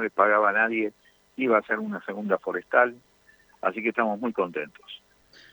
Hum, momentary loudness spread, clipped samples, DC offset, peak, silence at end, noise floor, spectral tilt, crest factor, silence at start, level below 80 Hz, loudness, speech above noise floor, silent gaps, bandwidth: none; 16 LU; under 0.1%; under 0.1%; -6 dBFS; 0.55 s; -59 dBFS; -7 dB/octave; 20 dB; 0 s; -74 dBFS; -25 LUFS; 34 dB; none; over 20 kHz